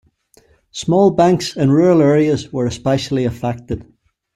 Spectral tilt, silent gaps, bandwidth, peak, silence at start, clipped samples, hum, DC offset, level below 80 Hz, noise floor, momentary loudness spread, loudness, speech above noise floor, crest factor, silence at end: -6.5 dB/octave; none; 13.5 kHz; -2 dBFS; 0.75 s; under 0.1%; none; under 0.1%; -46 dBFS; -53 dBFS; 14 LU; -15 LUFS; 39 dB; 14 dB; 0.55 s